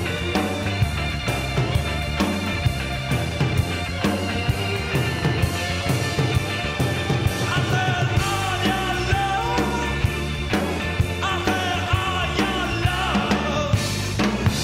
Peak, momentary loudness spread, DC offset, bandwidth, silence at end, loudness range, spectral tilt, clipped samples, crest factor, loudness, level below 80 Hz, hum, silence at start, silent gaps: -6 dBFS; 3 LU; under 0.1%; 16 kHz; 0 s; 2 LU; -5 dB/octave; under 0.1%; 16 dB; -22 LUFS; -34 dBFS; none; 0 s; none